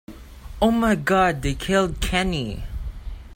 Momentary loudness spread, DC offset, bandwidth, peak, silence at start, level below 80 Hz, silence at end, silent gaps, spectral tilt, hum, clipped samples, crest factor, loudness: 16 LU; under 0.1%; 16.5 kHz; -6 dBFS; 0.1 s; -34 dBFS; 0 s; none; -5 dB/octave; none; under 0.1%; 18 dB; -21 LUFS